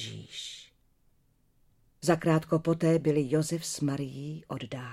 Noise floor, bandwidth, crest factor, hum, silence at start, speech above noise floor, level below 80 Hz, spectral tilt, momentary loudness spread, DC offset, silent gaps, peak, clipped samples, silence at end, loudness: -67 dBFS; 15 kHz; 18 dB; none; 0 s; 39 dB; -64 dBFS; -6 dB/octave; 14 LU; under 0.1%; none; -12 dBFS; under 0.1%; 0 s; -30 LUFS